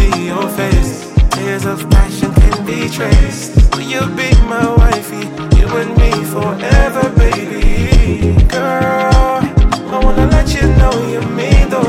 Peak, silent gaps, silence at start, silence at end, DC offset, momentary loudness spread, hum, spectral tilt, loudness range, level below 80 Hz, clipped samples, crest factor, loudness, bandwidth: 0 dBFS; none; 0 s; 0 s; under 0.1%; 6 LU; none; -6 dB/octave; 1 LU; -12 dBFS; under 0.1%; 10 dB; -13 LUFS; 15.5 kHz